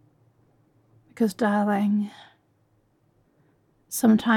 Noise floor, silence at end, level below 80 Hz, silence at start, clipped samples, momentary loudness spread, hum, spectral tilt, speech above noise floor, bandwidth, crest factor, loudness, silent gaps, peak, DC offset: -66 dBFS; 0 s; -70 dBFS; 1.2 s; under 0.1%; 10 LU; none; -5.5 dB/octave; 44 dB; 17.5 kHz; 18 dB; -24 LUFS; none; -8 dBFS; under 0.1%